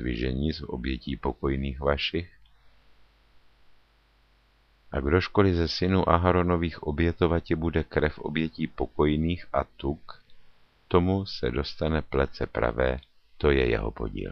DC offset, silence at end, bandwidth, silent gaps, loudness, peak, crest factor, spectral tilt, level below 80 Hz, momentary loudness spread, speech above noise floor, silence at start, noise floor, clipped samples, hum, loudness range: under 0.1%; 0 s; 6.6 kHz; none; -27 LUFS; -4 dBFS; 22 dB; -8 dB/octave; -38 dBFS; 10 LU; 36 dB; 0 s; -63 dBFS; under 0.1%; none; 8 LU